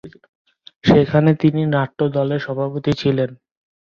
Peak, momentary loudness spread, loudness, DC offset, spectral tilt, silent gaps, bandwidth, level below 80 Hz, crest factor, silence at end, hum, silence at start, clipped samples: -2 dBFS; 8 LU; -18 LUFS; under 0.1%; -8.5 dB/octave; 0.29-0.45 s, 0.76-0.81 s; 7 kHz; -48 dBFS; 16 dB; 0.65 s; none; 0.05 s; under 0.1%